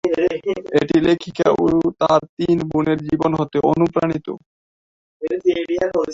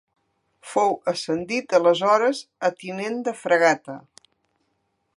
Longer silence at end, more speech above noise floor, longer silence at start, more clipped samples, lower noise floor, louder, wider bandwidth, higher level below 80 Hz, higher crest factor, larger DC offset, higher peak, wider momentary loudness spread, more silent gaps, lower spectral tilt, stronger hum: second, 0 s vs 1.15 s; first, over 72 dB vs 51 dB; second, 0.05 s vs 0.65 s; neither; first, under -90 dBFS vs -73 dBFS; first, -19 LUFS vs -22 LUFS; second, 7.6 kHz vs 11.5 kHz; first, -50 dBFS vs -72 dBFS; about the same, 16 dB vs 20 dB; neither; about the same, -2 dBFS vs -4 dBFS; about the same, 8 LU vs 10 LU; first, 2.29-2.37 s, 4.46-5.20 s vs none; first, -7 dB/octave vs -4 dB/octave; neither